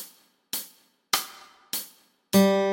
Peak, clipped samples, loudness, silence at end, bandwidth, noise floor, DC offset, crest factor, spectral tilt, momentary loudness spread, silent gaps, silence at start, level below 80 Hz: -8 dBFS; under 0.1%; -26 LUFS; 0 s; 17 kHz; -54 dBFS; under 0.1%; 20 dB; -4.5 dB/octave; 23 LU; none; 0 s; -70 dBFS